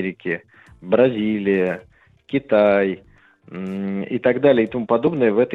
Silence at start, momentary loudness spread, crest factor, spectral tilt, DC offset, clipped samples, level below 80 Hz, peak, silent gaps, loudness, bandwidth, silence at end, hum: 0 s; 13 LU; 16 dB; -9 dB/octave; under 0.1%; under 0.1%; -58 dBFS; -2 dBFS; none; -19 LUFS; 4.8 kHz; 0 s; none